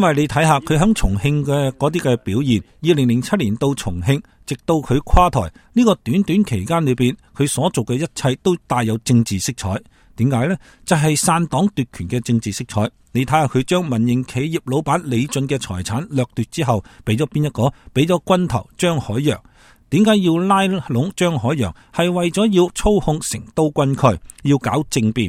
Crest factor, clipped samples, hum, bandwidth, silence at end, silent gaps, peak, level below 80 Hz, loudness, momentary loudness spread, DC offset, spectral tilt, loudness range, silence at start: 18 dB; under 0.1%; none; 16 kHz; 0 s; none; 0 dBFS; -34 dBFS; -18 LUFS; 7 LU; under 0.1%; -6 dB/octave; 2 LU; 0 s